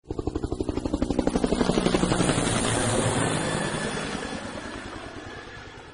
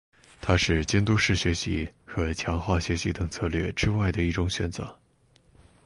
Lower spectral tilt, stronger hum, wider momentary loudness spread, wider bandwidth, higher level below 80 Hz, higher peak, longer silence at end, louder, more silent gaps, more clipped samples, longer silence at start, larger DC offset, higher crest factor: about the same, -4.5 dB/octave vs -5 dB/octave; neither; first, 15 LU vs 9 LU; about the same, 11.5 kHz vs 11.5 kHz; about the same, -40 dBFS vs -36 dBFS; about the same, -6 dBFS vs -8 dBFS; second, 0 s vs 0.9 s; about the same, -26 LUFS vs -27 LUFS; neither; neither; second, 0.05 s vs 0.4 s; neither; about the same, 20 dB vs 18 dB